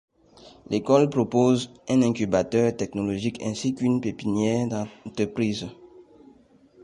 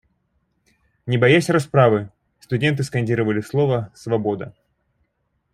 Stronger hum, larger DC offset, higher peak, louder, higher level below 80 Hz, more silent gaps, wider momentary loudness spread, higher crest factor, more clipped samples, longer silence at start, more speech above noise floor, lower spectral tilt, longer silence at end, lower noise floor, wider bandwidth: neither; neither; second, -6 dBFS vs -2 dBFS; second, -24 LUFS vs -20 LUFS; about the same, -56 dBFS vs -58 dBFS; neither; second, 9 LU vs 13 LU; about the same, 18 dB vs 20 dB; neither; second, 0.45 s vs 1.05 s; second, 32 dB vs 52 dB; about the same, -6.5 dB/octave vs -6.5 dB/octave; second, 0.85 s vs 1.05 s; second, -55 dBFS vs -71 dBFS; second, 11 kHz vs 14 kHz